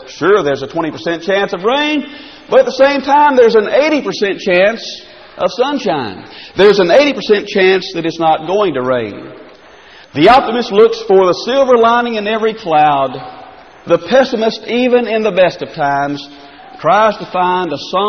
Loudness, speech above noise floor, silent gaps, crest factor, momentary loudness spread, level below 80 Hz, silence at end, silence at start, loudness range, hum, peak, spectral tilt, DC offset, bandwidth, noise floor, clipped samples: -12 LUFS; 27 dB; none; 12 dB; 11 LU; -50 dBFS; 0 s; 0 s; 3 LU; none; 0 dBFS; -5 dB/octave; 0.2%; 6.6 kHz; -39 dBFS; under 0.1%